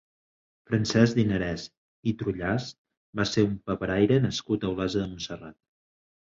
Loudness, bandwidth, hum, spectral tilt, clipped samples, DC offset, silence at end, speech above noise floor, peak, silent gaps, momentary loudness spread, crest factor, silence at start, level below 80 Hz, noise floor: -27 LUFS; 7.8 kHz; none; -6 dB/octave; under 0.1%; under 0.1%; 0.7 s; over 64 dB; -6 dBFS; 1.77-2.03 s, 2.78-2.85 s, 2.97-3.13 s; 14 LU; 22 dB; 0.7 s; -50 dBFS; under -90 dBFS